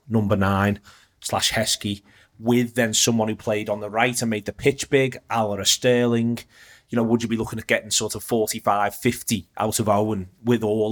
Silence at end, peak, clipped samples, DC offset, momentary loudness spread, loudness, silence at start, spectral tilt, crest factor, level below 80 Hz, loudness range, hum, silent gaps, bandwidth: 0 s; -2 dBFS; under 0.1%; under 0.1%; 8 LU; -22 LUFS; 0.1 s; -4 dB/octave; 20 dB; -54 dBFS; 1 LU; none; none; over 20 kHz